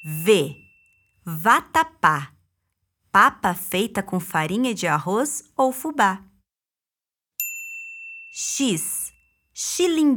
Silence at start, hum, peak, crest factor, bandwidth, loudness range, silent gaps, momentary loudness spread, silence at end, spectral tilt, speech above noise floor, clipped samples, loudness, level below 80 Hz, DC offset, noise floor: 0 s; none; -2 dBFS; 22 dB; over 20 kHz; 6 LU; none; 16 LU; 0 s; -3.5 dB/octave; over 69 dB; under 0.1%; -22 LUFS; -62 dBFS; under 0.1%; under -90 dBFS